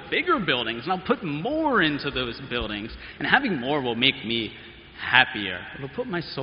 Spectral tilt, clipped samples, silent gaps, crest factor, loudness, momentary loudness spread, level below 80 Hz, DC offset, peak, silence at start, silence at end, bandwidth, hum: -1.5 dB/octave; under 0.1%; none; 26 dB; -24 LUFS; 13 LU; -50 dBFS; under 0.1%; 0 dBFS; 0 s; 0 s; 5.4 kHz; none